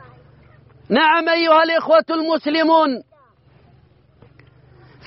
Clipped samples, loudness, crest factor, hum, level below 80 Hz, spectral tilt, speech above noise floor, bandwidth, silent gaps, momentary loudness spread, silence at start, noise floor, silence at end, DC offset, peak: under 0.1%; -16 LUFS; 16 dB; none; -62 dBFS; -1.5 dB/octave; 37 dB; 5.8 kHz; none; 7 LU; 0.9 s; -53 dBFS; 2.05 s; under 0.1%; -4 dBFS